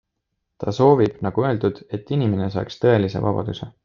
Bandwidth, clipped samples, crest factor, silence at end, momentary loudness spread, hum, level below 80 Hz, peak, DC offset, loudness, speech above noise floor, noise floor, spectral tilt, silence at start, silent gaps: 7.2 kHz; under 0.1%; 20 dB; 0.15 s; 12 LU; none; -52 dBFS; -2 dBFS; under 0.1%; -21 LUFS; 57 dB; -77 dBFS; -8.5 dB/octave; 0.6 s; none